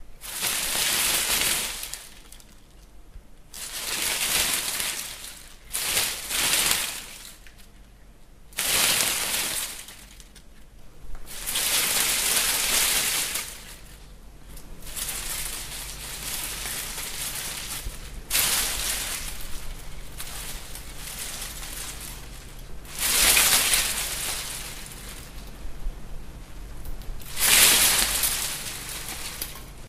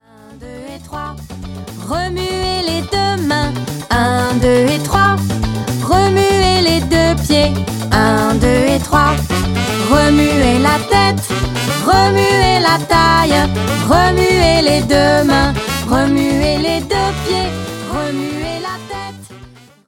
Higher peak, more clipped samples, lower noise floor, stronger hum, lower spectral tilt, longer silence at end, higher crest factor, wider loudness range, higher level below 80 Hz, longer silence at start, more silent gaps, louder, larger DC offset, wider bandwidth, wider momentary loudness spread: about the same, 0 dBFS vs 0 dBFS; neither; first, -48 dBFS vs -40 dBFS; neither; second, 0.5 dB/octave vs -5 dB/octave; second, 0 s vs 0.4 s; first, 28 dB vs 14 dB; first, 11 LU vs 7 LU; second, -42 dBFS vs -26 dBFS; second, 0 s vs 0.3 s; neither; second, -23 LUFS vs -13 LUFS; neither; about the same, 16 kHz vs 17 kHz; first, 22 LU vs 13 LU